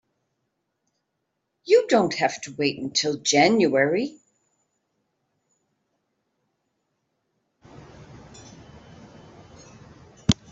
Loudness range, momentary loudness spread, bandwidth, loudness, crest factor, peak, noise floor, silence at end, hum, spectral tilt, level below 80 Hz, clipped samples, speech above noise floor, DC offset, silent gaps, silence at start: 11 LU; 9 LU; 8.2 kHz; -22 LUFS; 24 dB; -2 dBFS; -78 dBFS; 0.2 s; none; -4 dB/octave; -56 dBFS; under 0.1%; 56 dB; under 0.1%; none; 1.65 s